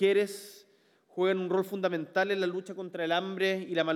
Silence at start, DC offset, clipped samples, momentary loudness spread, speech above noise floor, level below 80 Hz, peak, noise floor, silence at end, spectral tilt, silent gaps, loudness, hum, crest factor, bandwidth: 0 s; under 0.1%; under 0.1%; 11 LU; 36 dB; under -90 dBFS; -14 dBFS; -65 dBFS; 0 s; -5 dB/octave; none; -30 LUFS; none; 16 dB; 15.5 kHz